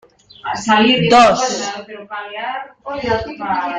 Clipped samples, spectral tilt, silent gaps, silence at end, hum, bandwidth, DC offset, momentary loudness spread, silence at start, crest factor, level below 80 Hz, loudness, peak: under 0.1%; -4 dB/octave; none; 0 s; none; 9.4 kHz; under 0.1%; 18 LU; 0.45 s; 16 dB; -48 dBFS; -15 LUFS; 0 dBFS